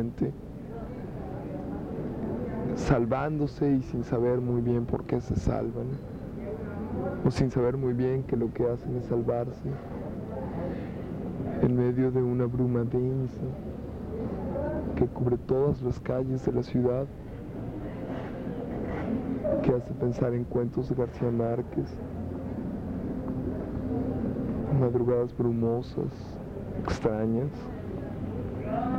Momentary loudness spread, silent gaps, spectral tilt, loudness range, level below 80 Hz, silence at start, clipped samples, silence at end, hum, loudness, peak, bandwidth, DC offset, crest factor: 11 LU; none; -9 dB/octave; 3 LU; -44 dBFS; 0 s; under 0.1%; 0 s; none; -30 LUFS; -12 dBFS; 8.4 kHz; under 0.1%; 18 dB